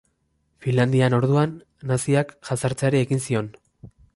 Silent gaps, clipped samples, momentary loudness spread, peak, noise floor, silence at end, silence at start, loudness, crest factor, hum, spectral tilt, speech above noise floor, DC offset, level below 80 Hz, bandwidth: none; under 0.1%; 9 LU; -8 dBFS; -69 dBFS; 0.3 s; 0.6 s; -22 LUFS; 16 dB; none; -6.5 dB/octave; 48 dB; under 0.1%; -56 dBFS; 11.5 kHz